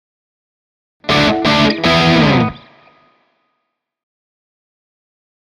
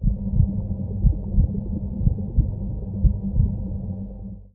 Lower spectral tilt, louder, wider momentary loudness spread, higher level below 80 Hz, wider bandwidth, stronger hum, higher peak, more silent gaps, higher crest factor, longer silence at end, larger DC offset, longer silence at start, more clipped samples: second, -5.5 dB/octave vs -17 dB/octave; first, -12 LUFS vs -25 LUFS; about the same, 7 LU vs 8 LU; second, -40 dBFS vs -26 dBFS; first, 13 kHz vs 1.1 kHz; neither; first, 0 dBFS vs -4 dBFS; neither; about the same, 16 dB vs 18 dB; first, 2.9 s vs 0.05 s; neither; first, 1.05 s vs 0 s; neither